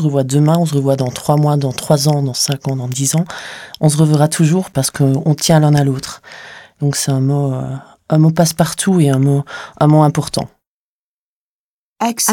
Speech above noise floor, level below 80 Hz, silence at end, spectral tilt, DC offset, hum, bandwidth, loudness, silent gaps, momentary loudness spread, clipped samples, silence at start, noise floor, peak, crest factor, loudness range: over 76 dB; -50 dBFS; 0 s; -5.5 dB/octave; under 0.1%; none; 17 kHz; -14 LUFS; 10.67-11.96 s; 12 LU; under 0.1%; 0 s; under -90 dBFS; 0 dBFS; 14 dB; 2 LU